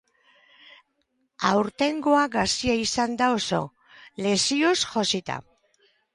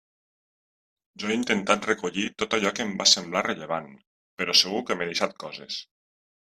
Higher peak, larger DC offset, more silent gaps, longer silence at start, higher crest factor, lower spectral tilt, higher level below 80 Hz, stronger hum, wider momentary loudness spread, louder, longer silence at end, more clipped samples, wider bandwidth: about the same, -6 dBFS vs -4 dBFS; neither; second, none vs 4.07-4.37 s; first, 1.4 s vs 1.2 s; second, 18 dB vs 24 dB; first, -3.5 dB/octave vs -2 dB/octave; first, -56 dBFS vs -68 dBFS; neither; second, 9 LU vs 14 LU; about the same, -24 LUFS vs -24 LUFS; about the same, 0.75 s vs 0.65 s; neither; second, 11.5 kHz vs 14 kHz